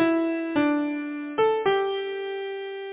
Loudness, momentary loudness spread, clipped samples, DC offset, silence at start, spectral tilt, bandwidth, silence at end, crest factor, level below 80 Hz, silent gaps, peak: -26 LUFS; 9 LU; under 0.1%; under 0.1%; 0 s; -9 dB/octave; 4 kHz; 0 s; 14 dB; -66 dBFS; none; -10 dBFS